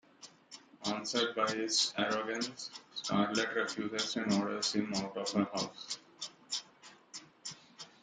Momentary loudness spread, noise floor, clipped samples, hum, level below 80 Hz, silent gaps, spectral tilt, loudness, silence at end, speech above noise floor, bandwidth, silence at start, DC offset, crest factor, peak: 19 LU; -59 dBFS; under 0.1%; none; -76 dBFS; none; -3 dB/octave; -34 LUFS; 0.15 s; 24 dB; 9.6 kHz; 0.2 s; under 0.1%; 20 dB; -16 dBFS